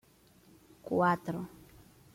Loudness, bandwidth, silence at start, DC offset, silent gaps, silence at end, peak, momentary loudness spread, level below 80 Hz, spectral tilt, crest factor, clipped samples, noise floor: -32 LUFS; 16.5 kHz; 0.85 s; under 0.1%; none; 0.65 s; -16 dBFS; 19 LU; -68 dBFS; -7.5 dB/octave; 20 dB; under 0.1%; -62 dBFS